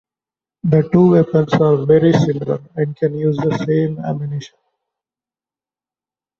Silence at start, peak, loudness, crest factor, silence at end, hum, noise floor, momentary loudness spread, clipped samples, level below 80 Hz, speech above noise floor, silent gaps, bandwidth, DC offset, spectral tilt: 0.65 s; 0 dBFS; -16 LUFS; 16 dB; 1.95 s; none; under -90 dBFS; 11 LU; under 0.1%; -52 dBFS; over 75 dB; none; 7 kHz; under 0.1%; -8.5 dB/octave